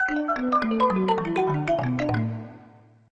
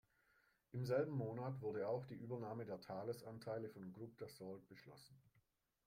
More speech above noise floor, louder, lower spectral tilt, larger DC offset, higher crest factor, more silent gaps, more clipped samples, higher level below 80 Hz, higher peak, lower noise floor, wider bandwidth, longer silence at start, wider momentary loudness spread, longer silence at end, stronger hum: second, 29 dB vs 35 dB; first, -24 LUFS vs -48 LUFS; about the same, -7.5 dB/octave vs -7.5 dB/octave; neither; about the same, 16 dB vs 20 dB; neither; neither; first, -52 dBFS vs -82 dBFS; first, -10 dBFS vs -28 dBFS; second, -52 dBFS vs -82 dBFS; second, 8.8 kHz vs 16 kHz; second, 0 s vs 0.75 s; second, 8 LU vs 17 LU; second, 0.5 s vs 0.65 s; neither